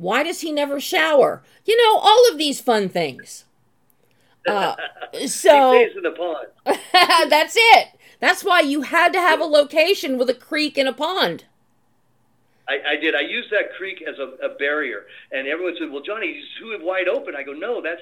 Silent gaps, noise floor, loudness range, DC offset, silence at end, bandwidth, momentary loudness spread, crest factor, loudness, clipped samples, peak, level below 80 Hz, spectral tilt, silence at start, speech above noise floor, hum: none; -65 dBFS; 10 LU; under 0.1%; 0 s; 17.5 kHz; 16 LU; 20 dB; -18 LUFS; under 0.1%; 0 dBFS; -74 dBFS; -2.5 dB/octave; 0 s; 46 dB; none